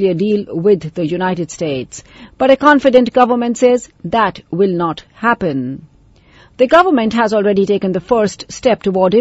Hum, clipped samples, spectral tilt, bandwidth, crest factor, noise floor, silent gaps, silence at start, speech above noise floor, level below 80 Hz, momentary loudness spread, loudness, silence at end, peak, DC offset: none; 0.1%; -6 dB/octave; 8 kHz; 14 dB; -47 dBFS; none; 0 s; 33 dB; -48 dBFS; 11 LU; -14 LUFS; 0 s; 0 dBFS; under 0.1%